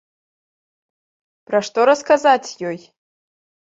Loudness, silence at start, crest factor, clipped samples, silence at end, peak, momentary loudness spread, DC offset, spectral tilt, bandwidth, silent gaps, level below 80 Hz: -17 LUFS; 1.5 s; 20 dB; under 0.1%; 0.85 s; -2 dBFS; 14 LU; under 0.1%; -3.5 dB/octave; 7.8 kHz; none; -70 dBFS